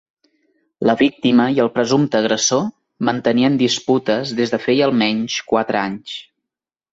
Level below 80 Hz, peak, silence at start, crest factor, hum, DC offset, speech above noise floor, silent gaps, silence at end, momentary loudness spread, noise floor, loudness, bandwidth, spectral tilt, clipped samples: -58 dBFS; -2 dBFS; 0.8 s; 16 dB; none; under 0.1%; 69 dB; none; 0.7 s; 7 LU; -85 dBFS; -17 LUFS; 7.8 kHz; -4 dB/octave; under 0.1%